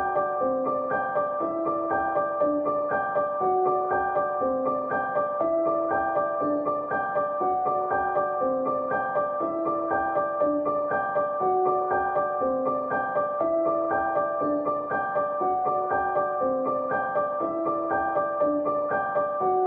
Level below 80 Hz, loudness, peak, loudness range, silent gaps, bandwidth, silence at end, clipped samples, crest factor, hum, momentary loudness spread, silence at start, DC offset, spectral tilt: -60 dBFS; -26 LUFS; -12 dBFS; 1 LU; none; 3.7 kHz; 0 s; under 0.1%; 12 dB; none; 2 LU; 0 s; under 0.1%; -10 dB/octave